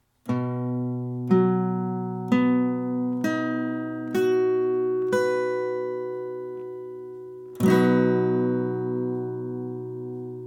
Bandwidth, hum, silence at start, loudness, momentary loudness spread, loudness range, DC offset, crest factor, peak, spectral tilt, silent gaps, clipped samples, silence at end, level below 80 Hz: 17 kHz; none; 0.25 s; -25 LUFS; 13 LU; 1 LU; under 0.1%; 16 dB; -8 dBFS; -8 dB/octave; none; under 0.1%; 0 s; -70 dBFS